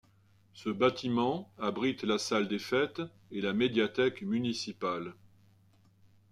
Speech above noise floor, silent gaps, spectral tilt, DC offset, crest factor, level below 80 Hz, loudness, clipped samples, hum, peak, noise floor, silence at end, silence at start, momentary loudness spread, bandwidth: 33 dB; none; -5 dB/octave; under 0.1%; 18 dB; -72 dBFS; -32 LUFS; under 0.1%; none; -14 dBFS; -65 dBFS; 1.2 s; 0.55 s; 10 LU; 13.5 kHz